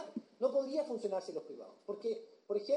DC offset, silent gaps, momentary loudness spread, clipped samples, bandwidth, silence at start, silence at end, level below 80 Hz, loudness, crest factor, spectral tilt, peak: under 0.1%; none; 12 LU; under 0.1%; 10.5 kHz; 0 s; 0 s; under -90 dBFS; -39 LUFS; 18 dB; -5.5 dB/octave; -20 dBFS